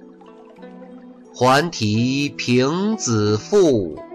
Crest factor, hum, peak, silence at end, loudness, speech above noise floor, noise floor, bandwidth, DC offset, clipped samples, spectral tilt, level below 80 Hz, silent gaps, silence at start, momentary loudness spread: 12 dB; none; -6 dBFS; 0 s; -18 LUFS; 25 dB; -43 dBFS; 15 kHz; under 0.1%; under 0.1%; -5 dB/octave; -54 dBFS; none; 0 s; 6 LU